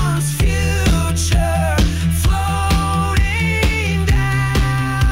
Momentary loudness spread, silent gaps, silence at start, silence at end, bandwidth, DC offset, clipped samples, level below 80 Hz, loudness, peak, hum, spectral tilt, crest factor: 1 LU; none; 0 s; 0 s; 16.5 kHz; under 0.1%; under 0.1%; -20 dBFS; -17 LUFS; -6 dBFS; none; -5 dB/octave; 10 dB